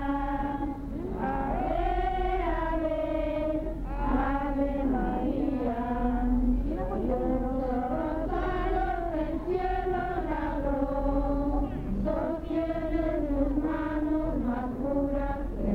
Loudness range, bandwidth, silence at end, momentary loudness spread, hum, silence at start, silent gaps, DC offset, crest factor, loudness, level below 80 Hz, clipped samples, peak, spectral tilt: 1 LU; 4.8 kHz; 0 s; 3 LU; none; 0 s; none; under 0.1%; 14 dB; -30 LUFS; -34 dBFS; under 0.1%; -14 dBFS; -9 dB/octave